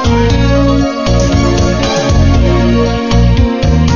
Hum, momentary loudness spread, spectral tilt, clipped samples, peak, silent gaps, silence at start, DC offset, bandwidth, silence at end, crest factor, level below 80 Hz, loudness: none; 2 LU; -6.5 dB/octave; under 0.1%; 0 dBFS; none; 0 s; under 0.1%; 7.2 kHz; 0 s; 8 dB; -14 dBFS; -10 LUFS